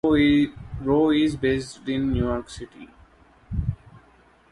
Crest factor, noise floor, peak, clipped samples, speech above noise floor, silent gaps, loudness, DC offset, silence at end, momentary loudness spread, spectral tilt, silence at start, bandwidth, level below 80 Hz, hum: 16 dB; -56 dBFS; -8 dBFS; under 0.1%; 34 dB; none; -23 LUFS; under 0.1%; 0.55 s; 19 LU; -7 dB/octave; 0.05 s; 11.5 kHz; -38 dBFS; none